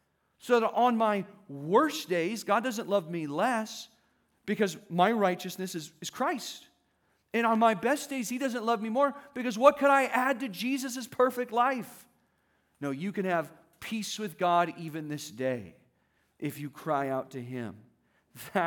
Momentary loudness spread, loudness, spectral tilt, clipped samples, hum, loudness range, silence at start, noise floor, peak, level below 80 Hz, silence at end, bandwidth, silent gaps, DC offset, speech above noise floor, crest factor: 15 LU; -29 LUFS; -4.5 dB/octave; under 0.1%; none; 6 LU; 0.45 s; -73 dBFS; -6 dBFS; -80 dBFS; 0 s; 19.5 kHz; none; under 0.1%; 44 dB; 24 dB